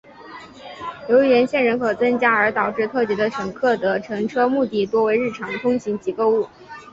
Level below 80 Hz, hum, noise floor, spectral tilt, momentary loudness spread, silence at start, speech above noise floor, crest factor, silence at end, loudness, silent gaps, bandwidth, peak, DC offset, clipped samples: -60 dBFS; none; -40 dBFS; -6 dB/octave; 17 LU; 0.2 s; 21 dB; 16 dB; 0.1 s; -19 LUFS; none; 7.8 kHz; -4 dBFS; under 0.1%; under 0.1%